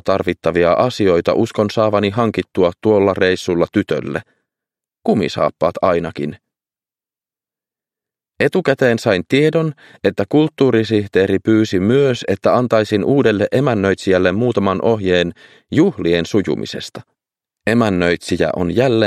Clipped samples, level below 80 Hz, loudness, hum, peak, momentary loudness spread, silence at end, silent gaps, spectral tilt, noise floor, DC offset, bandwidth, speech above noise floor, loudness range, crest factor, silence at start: under 0.1%; -50 dBFS; -16 LUFS; none; 0 dBFS; 7 LU; 0 s; none; -6.5 dB/octave; under -90 dBFS; under 0.1%; 13 kHz; over 75 dB; 6 LU; 16 dB; 0.05 s